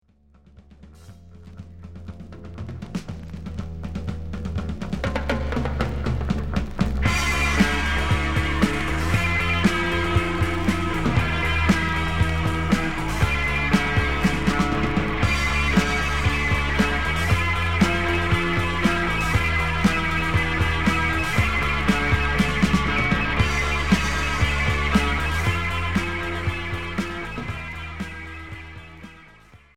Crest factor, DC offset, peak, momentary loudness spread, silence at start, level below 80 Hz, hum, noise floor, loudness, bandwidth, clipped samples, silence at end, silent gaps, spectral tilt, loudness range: 18 dB; under 0.1%; -4 dBFS; 13 LU; 0.7 s; -30 dBFS; none; -55 dBFS; -22 LUFS; 16 kHz; under 0.1%; 0.2 s; none; -5.5 dB/octave; 10 LU